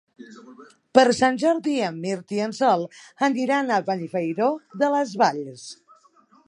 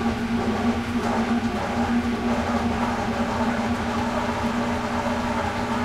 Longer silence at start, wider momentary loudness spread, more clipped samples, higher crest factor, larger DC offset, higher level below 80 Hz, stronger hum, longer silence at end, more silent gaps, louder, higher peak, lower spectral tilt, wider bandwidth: first, 0.2 s vs 0 s; first, 11 LU vs 2 LU; neither; first, 22 dB vs 12 dB; neither; second, -68 dBFS vs -40 dBFS; second, none vs 60 Hz at -30 dBFS; first, 0.75 s vs 0 s; neither; about the same, -22 LUFS vs -24 LUFS; first, 0 dBFS vs -12 dBFS; about the same, -5 dB/octave vs -5.5 dB/octave; second, 11 kHz vs 13.5 kHz